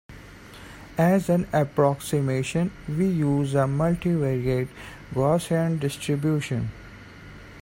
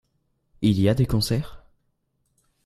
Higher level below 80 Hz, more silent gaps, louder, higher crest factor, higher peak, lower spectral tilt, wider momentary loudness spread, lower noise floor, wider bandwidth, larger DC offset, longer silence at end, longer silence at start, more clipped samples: about the same, -48 dBFS vs -44 dBFS; neither; about the same, -24 LUFS vs -23 LUFS; about the same, 18 dB vs 20 dB; about the same, -8 dBFS vs -6 dBFS; about the same, -7 dB/octave vs -6.5 dB/octave; first, 22 LU vs 8 LU; second, -44 dBFS vs -72 dBFS; first, 16.5 kHz vs 14 kHz; neither; second, 0 s vs 1.1 s; second, 0.1 s vs 0.6 s; neither